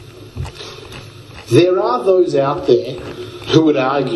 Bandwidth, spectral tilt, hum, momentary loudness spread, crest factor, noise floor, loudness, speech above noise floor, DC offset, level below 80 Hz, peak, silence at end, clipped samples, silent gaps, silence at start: 12 kHz; -6.5 dB/octave; none; 21 LU; 16 dB; -35 dBFS; -14 LUFS; 22 dB; under 0.1%; -46 dBFS; 0 dBFS; 0 s; under 0.1%; none; 0 s